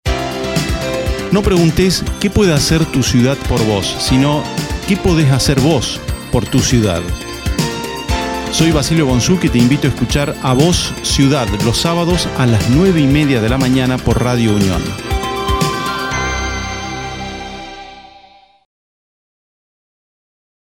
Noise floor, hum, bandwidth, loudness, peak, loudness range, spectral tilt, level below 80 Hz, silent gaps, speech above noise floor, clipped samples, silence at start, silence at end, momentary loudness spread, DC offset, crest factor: -45 dBFS; none; 17 kHz; -14 LUFS; 0 dBFS; 8 LU; -5 dB/octave; -26 dBFS; none; 32 dB; under 0.1%; 0.05 s; 2.6 s; 9 LU; under 0.1%; 14 dB